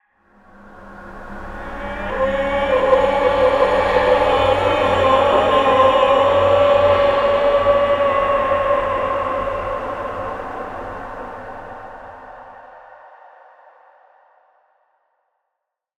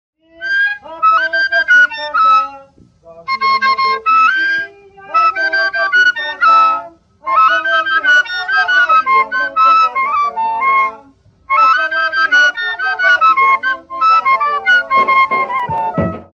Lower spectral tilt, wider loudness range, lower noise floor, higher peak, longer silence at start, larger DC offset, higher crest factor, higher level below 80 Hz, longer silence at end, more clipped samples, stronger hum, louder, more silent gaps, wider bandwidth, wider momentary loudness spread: first, -5.5 dB/octave vs -3 dB/octave; first, 17 LU vs 2 LU; first, -79 dBFS vs -46 dBFS; about the same, -2 dBFS vs -2 dBFS; first, 0.65 s vs 0.4 s; neither; about the same, 16 dB vs 12 dB; first, -40 dBFS vs -54 dBFS; first, 3.2 s vs 0.15 s; neither; neither; second, -16 LUFS vs -12 LUFS; neither; first, 10 kHz vs 7.8 kHz; first, 20 LU vs 8 LU